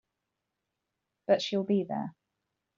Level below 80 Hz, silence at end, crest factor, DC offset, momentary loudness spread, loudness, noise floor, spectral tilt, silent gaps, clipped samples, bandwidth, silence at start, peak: -78 dBFS; 0.7 s; 22 dB; under 0.1%; 14 LU; -30 LUFS; -85 dBFS; -5 dB/octave; none; under 0.1%; 7.4 kHz; 1.3 s; -12 dBFS